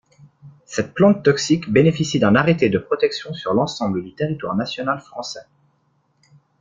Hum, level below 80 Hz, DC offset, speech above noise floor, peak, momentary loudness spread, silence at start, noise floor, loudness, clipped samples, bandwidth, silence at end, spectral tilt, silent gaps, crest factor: none; -54 dBFS; under 0.1%; 45 dB; -2 dBFS; 12 LU; 0.45 s; -64 dBFS; -19 LUFS; under 0.1%; 7.6 kHz; 1.2 s; -6 dB/octave; none; 18 dB